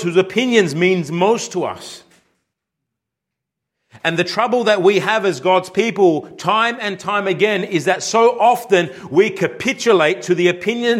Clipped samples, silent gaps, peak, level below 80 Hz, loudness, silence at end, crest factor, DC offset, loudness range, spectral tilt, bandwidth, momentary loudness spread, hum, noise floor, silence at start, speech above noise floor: under 0.1%; none; -2 dBFS; -66 dBFS; -16 LUFS; 0 s; 16 dB; under 0.1%; 7 LU; -4.5 dB/octave; 15 kHz; 6 LU; none; -81 dBFS; 0 s; 65 dB